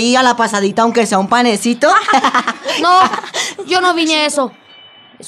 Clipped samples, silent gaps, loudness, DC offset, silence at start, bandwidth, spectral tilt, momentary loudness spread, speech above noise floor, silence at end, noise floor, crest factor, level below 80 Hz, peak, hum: under 0.1%; none; -13 LUFS; under 0.1%; 0 s; 14 kHz; -3 dB/octave; 8 LU; 28 dB; 0 s; -41 dBFS; 12 dB; -64 dBFS; 0 dBFS; none